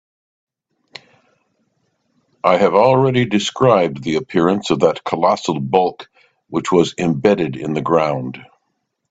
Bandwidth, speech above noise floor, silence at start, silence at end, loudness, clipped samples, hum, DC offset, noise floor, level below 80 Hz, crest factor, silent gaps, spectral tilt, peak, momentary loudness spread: 8.6 kHz; 56 dB; 2.45 s; 0.7 s; -16 LUFS; under 0.1%; none; under 0.1%; -71 dBFS; -56 dBFS; 18 dB; none; -6 dB/octave; 0 dBFS; 9 LU